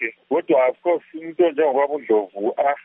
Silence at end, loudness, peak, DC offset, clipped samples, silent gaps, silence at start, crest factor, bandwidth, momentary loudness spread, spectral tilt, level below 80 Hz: 0.05 s; -20 LUFS; -6 dBFS; under 0.1%; under 0.1%; none; 0 s; 14 dB; 3.8 kHz; 7 LU; -3.5 dB/octave; -82 dBFS